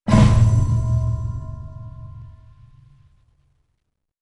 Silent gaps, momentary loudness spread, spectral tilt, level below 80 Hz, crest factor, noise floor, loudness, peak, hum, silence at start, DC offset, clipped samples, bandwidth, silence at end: none; 24 LU; -7.5 dB/octave; -28 dBFS; 18 dB; -74 dBFS; -18 LUFS; -2 dBFS; none; 0.05 s; under 0.1%; under 0.1%; 10.5 kHz; 1.9 s